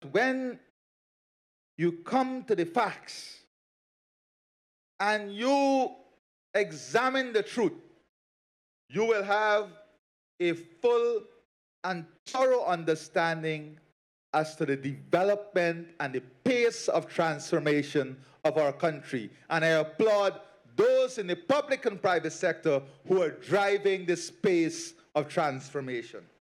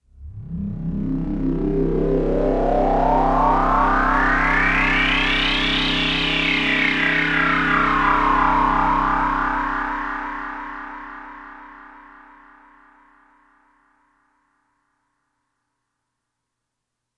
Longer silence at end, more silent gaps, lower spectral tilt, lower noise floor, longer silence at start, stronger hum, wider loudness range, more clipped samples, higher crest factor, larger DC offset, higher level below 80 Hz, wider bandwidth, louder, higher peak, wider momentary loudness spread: second, 0.3 s vs 5.15 s; first, 0.70-1.78 s, 3.47-4.99 s, 6.19-6.54 s, 8.09-8.88 s, 9.99-10.38 s, 11.45-11.83 s, 12.19-12.26 s, 13.92-14.33 s vs none; about the same, -5 dB/octave vs -5.5 dB/octave; first, under -90 dBFS vs -81 dBFS; second, 0 s vs 0.2 s; neither; second, 4 LU vs 13 LU; neither; about the same, 20 dB vs 16 dB; neither; second, -84 dBFS vs -32 dBFS; first, 13 kHz vs 9.4 kHz; second, -29 LUFS vs -19 LUFS; second, -10 dBFS vs -4 dBFS; second, 10 LU vs 15 LU